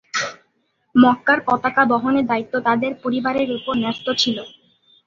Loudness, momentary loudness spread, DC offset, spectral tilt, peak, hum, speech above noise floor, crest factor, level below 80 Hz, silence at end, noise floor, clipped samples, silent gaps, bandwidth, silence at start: -19 LUFS; 8 LU; under 0.1%; -4 dB/octave; -2 dBFS; none; 48 dB; 18 dB; -58 dBFS; 0.6 s; -67 dBFS; under 0.1%; none; 7.4 kHz; 0.15 s